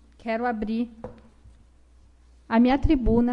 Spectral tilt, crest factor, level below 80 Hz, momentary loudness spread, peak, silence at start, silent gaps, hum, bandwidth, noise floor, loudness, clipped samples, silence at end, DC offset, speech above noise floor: -8.5 dB/octave; 16 dB; -34 dBFS; 15 LU; -8 dBFS; 0.25 s; none; none; 5.6 kHz; -54 dBFS; -24 LUFS; under 0.1%; 0 s; under 0.1%; 32 dB